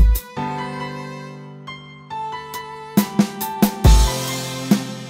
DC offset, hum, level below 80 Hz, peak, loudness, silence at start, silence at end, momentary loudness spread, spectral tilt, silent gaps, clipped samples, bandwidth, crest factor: under 0.1%; none; -22 dBFS; -2 dBFS; -21 LUFS; 0 s; 0 s; 20 LU; -5 dB/octave; none; under 0.1%; 16.5 kHz; 18 dB